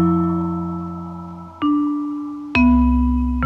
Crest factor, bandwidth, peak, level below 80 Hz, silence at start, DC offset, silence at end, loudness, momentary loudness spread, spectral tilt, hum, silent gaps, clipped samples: 16 dB; 5.8 kHz; -2 dBFS; -26 dBFS; 0 s; under 0.1%; 0 s; -19 LUFS; 16 LU; -9 dB/octave; none; none; under 0.1%